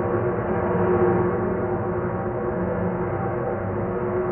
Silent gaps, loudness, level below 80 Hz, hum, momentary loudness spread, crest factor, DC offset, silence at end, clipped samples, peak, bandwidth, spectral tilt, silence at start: none; -24 LUFS; -42 dBFS; none; 6 LU; 16 dB; under 0.1%; 0 s; under 0.1%; -8 dBFS; 3.2 kHz; -5.5 dB/octave; 0 s